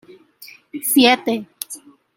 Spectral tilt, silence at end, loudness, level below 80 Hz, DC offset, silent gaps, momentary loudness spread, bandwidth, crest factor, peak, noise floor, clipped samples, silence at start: -2 dB/octave; 0.4 s; -16 LUFS; -66 dBFS; under 0.1%; none; 20 LU; 17 kHz; 20 dB; -2 dBFS; -45 dBFS; under 0.1%; 0.4 s